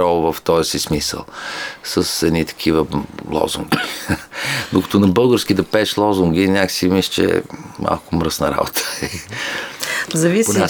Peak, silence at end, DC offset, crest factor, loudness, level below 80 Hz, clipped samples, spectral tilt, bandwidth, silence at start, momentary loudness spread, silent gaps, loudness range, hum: 0 dBFS; 0 s; under 0.1%; 18 dB; -18 LUFS; -42 dBFS; under 0.1%; -4.5 dB/octave; over 20 kHz; 0 s; 10 LU; none; 4 LU; none